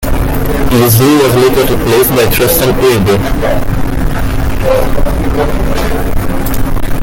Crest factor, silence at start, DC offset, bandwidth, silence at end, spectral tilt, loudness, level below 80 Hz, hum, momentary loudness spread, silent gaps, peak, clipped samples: 8 dB; 0 s; under 0.1%; 17.5 kHz; 0 s; -5.5 dB/octave; -11 LUFS; -16 dBFS; none; 9 LU; none; 0 dBFS; under 0.1%